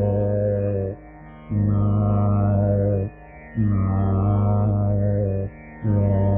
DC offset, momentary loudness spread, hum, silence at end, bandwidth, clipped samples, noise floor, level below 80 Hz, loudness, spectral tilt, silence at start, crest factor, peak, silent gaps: under 0.1%; 9 LU; none; 0 s; 2.6 kHz; under 0.1%; -42 dBFS; -38 dBFS; -22 LUFS; -12 dB/octave; 0 s; 12 dB; -10 dBFS; none